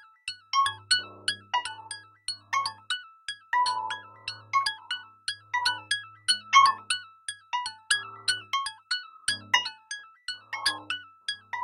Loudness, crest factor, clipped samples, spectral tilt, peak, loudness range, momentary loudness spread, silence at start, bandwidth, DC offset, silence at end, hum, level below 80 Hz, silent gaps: -28 LUFS; 24 dB; under 0.1%; 1.5 dB/octave; -6 dBFS; 5 LU; 14 LU; 0.25 s; 16 kHz; under 0.1%; 0 s; none; -70 dBFS; none